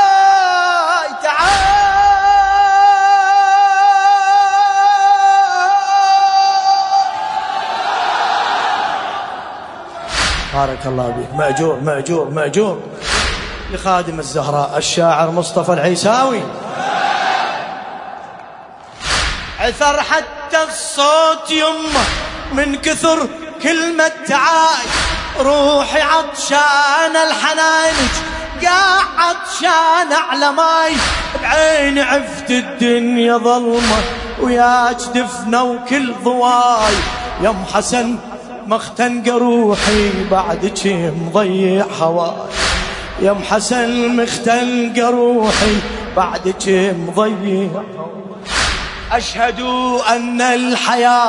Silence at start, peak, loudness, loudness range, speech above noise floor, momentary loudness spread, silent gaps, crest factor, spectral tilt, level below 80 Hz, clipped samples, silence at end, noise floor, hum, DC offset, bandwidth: 0 s; 0 dBFS; -14 LUFS; 7 LU; 21 dB; 9 LU; none; 14 dB; -3.5 dB/octave; -34 dBFS; under 0.1%; 0 s; -35 dBFS; none; under 0.1%; 11 kHz